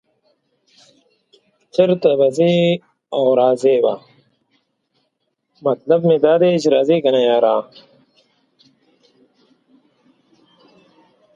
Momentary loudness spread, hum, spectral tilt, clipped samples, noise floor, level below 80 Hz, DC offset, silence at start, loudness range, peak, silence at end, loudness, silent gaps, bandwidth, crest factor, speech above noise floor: 10 LU; none; -6.5 dB/octave; under 0.1%; -71 dBFS; -68 dBFS; under 0.1%; 1.75 s; 4 LU; 0 dBFS; 3.75 s; -16 LUFS; none; 9.6 kHz; 18 dB; 57 dB